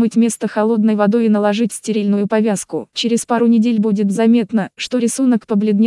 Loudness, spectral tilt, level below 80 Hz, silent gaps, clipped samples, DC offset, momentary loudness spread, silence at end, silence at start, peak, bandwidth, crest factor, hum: -16 LUFS; -5.5 dB/octave; -68 dBFS; none; under 0.1%; under 0.1%; 6 LU; 0 s; 0 s; -2 dBFS; 12 kHz; 12 dB; none